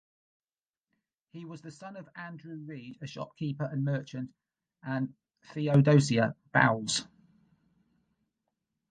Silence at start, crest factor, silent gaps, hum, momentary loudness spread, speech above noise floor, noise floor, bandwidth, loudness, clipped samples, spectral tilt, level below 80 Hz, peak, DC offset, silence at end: 1.35 s; 24 dB; none; none; 21 LU; over 60 dB; under -90 dBFS; 9.4 kHz; -28 LUFS; under 0.1%; -5.5 dB/octave; -70 dBFS; -8 dBFS; under 0.1%; 1.85 s